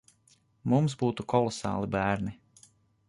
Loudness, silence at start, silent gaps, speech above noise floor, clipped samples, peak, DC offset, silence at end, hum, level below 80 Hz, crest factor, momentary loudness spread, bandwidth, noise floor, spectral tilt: -29 LUFS; 0.65 s; none; 38 dB; under 0.1%; -10 dBFS; under 0.1%; 0.75 s; none; -56 dBFS; 20 dB; 7 LU; 11.5 kHz; -66 dBFS; -6.5 dB/octave